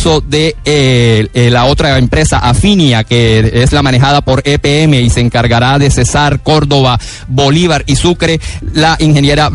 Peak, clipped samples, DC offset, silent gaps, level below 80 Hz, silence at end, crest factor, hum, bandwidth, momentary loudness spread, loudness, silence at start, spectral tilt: 0 dBFS; under 0.1%; under 0.1%; none; -22 dBFS; 0 s; 8 dB; none; 11.5 kHz; 3 LU; -9 LUFS; 0 s; -5 dB/octave